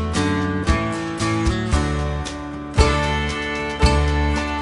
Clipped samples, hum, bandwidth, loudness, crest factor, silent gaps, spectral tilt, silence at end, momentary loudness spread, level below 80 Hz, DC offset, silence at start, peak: under 0.1%; none; 11.5 kHz; -21 LUFS; 18 dB; none; -5.5 dB/octave; 0 s; 7 LU; -24 dBFS; under 0.1%; 0 s; -2 dBFS